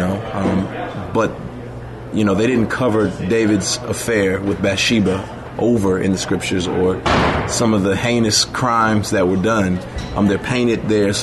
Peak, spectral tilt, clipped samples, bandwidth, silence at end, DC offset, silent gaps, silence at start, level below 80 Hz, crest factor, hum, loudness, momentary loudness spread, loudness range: -2 dBFS; -5 dB/octave; under 0.1%; 12.5 kHz; 0 s; under 0.1%; none; 0 s; -38 dBFS; 14 dB; none; -17 LUFS; 9 LU; 2 LU